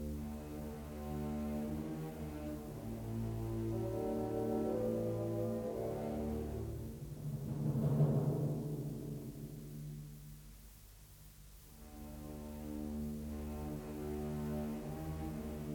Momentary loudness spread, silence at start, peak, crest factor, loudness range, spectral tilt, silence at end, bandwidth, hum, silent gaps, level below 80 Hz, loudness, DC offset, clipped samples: 17 LU; 0 s; -22 dBFS; 18 dB; 11 LU; -8 dB/octave; 0 s; over 20 kHz; none; none; -54 dBFS; -41 LUFS; under 0.1%; under 0.1%